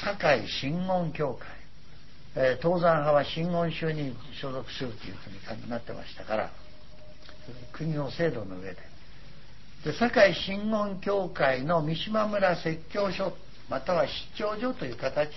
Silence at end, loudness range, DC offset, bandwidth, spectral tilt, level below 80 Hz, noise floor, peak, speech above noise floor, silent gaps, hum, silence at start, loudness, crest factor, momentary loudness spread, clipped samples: 0 s; 10 LU; 1%; 6 kHz; -6.5 dB/octave; -54 dBFS; -52 dBFS; -6 dBFS; 24 dB; none; none; 0 s; -29 LUFS; 22 dB; 17 LU; under 0.1%